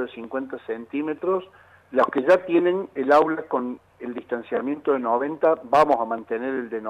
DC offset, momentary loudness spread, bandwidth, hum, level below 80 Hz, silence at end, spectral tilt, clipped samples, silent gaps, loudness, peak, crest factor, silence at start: under 0.1%; 13 LU; 11 kHz; none; -66 dBFS; 0 s; -6.5 dB/octave; under 0.1%; none; -23 LUFS; -8 dBFS; 16 dB; 0 s